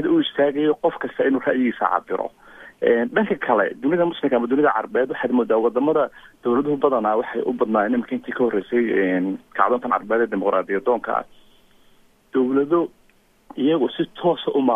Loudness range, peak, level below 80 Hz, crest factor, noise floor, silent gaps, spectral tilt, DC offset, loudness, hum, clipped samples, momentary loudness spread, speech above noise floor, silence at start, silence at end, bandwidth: 3 LU; -2 dBFS; -62 dBFS; 18 dB; -57 dBFS; none; -8 dB/octave; under 0.1%; -21 LUFS; none; under 0.1%; 5 LU; 37 dB; 0 s; 0 s; 3.9 kHz